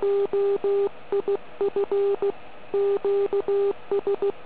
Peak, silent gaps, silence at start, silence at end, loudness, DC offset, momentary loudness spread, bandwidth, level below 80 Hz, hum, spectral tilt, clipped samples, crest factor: -16 dBFS; none; 0 s; 0 s; -25 LUFS; 1%; 5 LU; 4 kHz; -64 dBFS; none; -9.5 dB/octave; under 0.1%; 8 dB